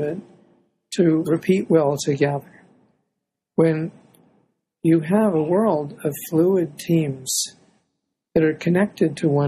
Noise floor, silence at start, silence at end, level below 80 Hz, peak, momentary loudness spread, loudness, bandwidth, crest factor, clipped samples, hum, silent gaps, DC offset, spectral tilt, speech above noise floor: -79 dBFS; 0 s; 0 s; -60 dBFS; -4 dBFS; 10 LU; -21 LUFS; 14 kHz; 18 dB; under 0.1%; none; none; under 0.1%; -6 dB/octave; 60 dB